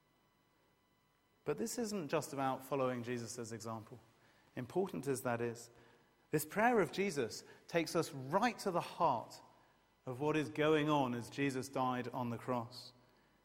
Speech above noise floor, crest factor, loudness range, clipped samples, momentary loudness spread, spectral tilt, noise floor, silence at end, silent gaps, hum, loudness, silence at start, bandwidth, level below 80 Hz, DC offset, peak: 38 dB; 22 dB; 5 LU; under 0.1%; 16 LU; -5 dB/octave; -75 dBFS; 0.55 s; none; none; -38 LUFS; 1.45 s; 16 kHz; -76 dBFS; under 0.1%; -18 dBFS